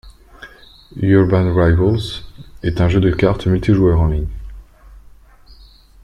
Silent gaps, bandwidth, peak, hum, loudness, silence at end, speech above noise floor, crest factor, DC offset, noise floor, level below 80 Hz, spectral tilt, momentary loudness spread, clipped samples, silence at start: none; 10 kHz; -2 dBFS; none; -16 LUFS; 1.05 s; 30 dB; 16 dB; under 0.1%; -44 dBFS; -30 dBFS; -8.5 dB/octave; 14 LU; under 0.1%; 0.05 s